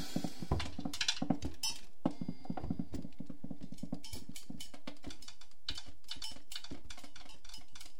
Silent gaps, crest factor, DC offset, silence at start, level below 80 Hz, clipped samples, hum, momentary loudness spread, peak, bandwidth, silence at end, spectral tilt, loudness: none; 26 dB; 2%; 0 s; -54 dBFS; under 0.1%; none; 16 LU; -16 dBFS; 16 kHz; 0 s; -4 dB/octave; -42 LUFS